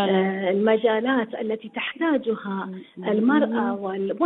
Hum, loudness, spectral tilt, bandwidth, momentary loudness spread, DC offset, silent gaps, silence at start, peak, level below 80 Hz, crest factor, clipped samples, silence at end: none; -23 LUFS; -9.5 dB/octave; 4.1 kHz; 10 LU; under 0.1%; none; 0 s; -8 dBFS; -70 dBFS; 16 dB; under 0.1%; 0 s